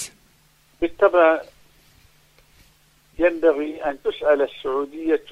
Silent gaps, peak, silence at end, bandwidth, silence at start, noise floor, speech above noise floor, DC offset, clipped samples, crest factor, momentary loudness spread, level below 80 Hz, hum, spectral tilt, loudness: none; -4 dBFS; 0.1 s; 14.5 kHz; 0 s; -58 dBFS; 38 dB; under 0.1%; under 0.1%; 18 dB; 11 LU; -52 dBFS; none; -4 dB/octave; -21 LUFS